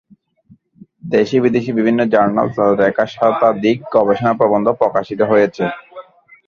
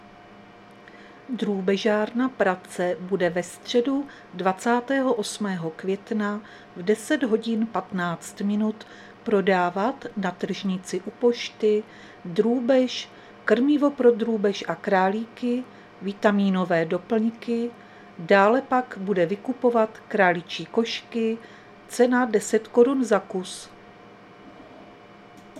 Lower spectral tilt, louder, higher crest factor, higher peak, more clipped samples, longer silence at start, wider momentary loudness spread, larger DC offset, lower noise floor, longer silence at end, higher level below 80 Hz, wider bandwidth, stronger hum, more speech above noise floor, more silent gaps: first, -7.5 dB/octave vs -5.5 dB/octave; first, -15 LUFS vs -24 LUFS; about the same, 16 dB vs 20 dB; first, 0 dBFS vs -4 dBFS; neither; first, 1.05 s vs 0.3 s; second, 4 LU vs 12 LU; neither; about the same, -51 dBFS vs -48 dBFS; first, 0.45 s vs 0 s; first, -54 dBFS vs -68 dBFS; second, 7 kHz vs 14 kHz; neither; first, 36 dB vs 24 dB; neither